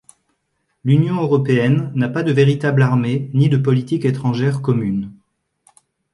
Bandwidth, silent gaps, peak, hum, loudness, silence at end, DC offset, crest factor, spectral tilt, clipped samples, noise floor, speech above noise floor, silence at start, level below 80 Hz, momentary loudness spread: 11 kHz; none; -2 dBFS; none; -17 LUFS; 1 s; under 0.1%; 14 dB; -8.5 dB/octave; under 0.1%; -70 dBFS; 54 dB; 0.85 s; -56 dBFS; 5 LU